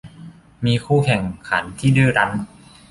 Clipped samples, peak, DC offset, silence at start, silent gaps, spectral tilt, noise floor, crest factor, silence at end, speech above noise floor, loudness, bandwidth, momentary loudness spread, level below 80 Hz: under 0.1%; -2 dBFS; under 0.1%; 0.05 s; none; -6.5 dB/octave; -41 dBFS; 18 dB; 0.45 s; 23 dB; -19 LUFS; 11.5 kHz; 9 LU; -46 dBFS